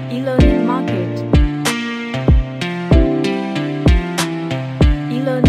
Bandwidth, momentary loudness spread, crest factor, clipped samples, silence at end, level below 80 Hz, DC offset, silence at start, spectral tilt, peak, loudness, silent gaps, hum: 13.5 kHz; 7 LU; 14 dB; under 0.1%; 0 s; -20 dBFS; under 0.1%; 0 s; -6.5 dB/octave; 0 dBFS; -17 LUFS; none; none